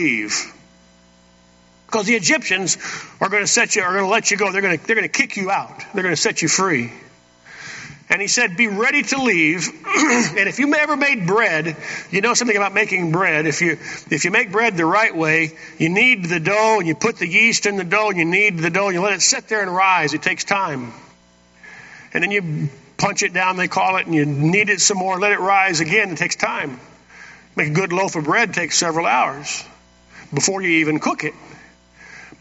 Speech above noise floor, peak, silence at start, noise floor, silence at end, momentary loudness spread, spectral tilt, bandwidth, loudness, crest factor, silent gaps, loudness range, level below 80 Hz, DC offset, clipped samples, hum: 34 dB; 0 dBFS; 0 s; -52 dBFS; 0.1 s; 10 LU; -3 dB/octave; 8.2 kHz; -17 LUFS; 18 dB; none; 4 LU; -62 dBFS; under 0.1%; under 0.1%; 60 Hz at -50 dBFS